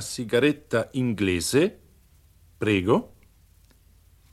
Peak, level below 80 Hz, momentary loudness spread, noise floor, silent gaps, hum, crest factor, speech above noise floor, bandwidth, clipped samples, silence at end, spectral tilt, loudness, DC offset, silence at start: -6 dBFS; -56 dBFS; 5 LU; -57 dBFS; none; none; 20 dB; 33 dB; 14.5 kHz; under 0.1%; 1.25 s; -5 dB/octave; -24 LUFS; under 0.1%; 0 s